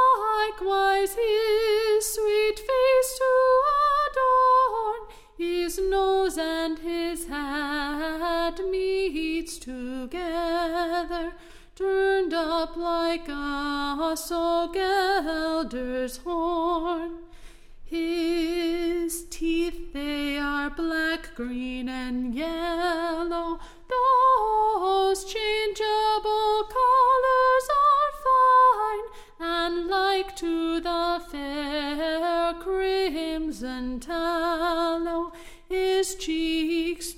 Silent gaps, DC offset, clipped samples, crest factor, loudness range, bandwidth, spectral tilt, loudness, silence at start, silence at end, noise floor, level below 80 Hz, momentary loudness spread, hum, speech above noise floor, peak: none; under 0.1%; under 0.1%; 14 dB; 7 LU; 16.5 kHz; -2.5 dB/octave; -25 LUFS; 0 s; 0 s; -46 dBFS; -46 dBFS; 11 LU; none; 19 dB; -10 dBFS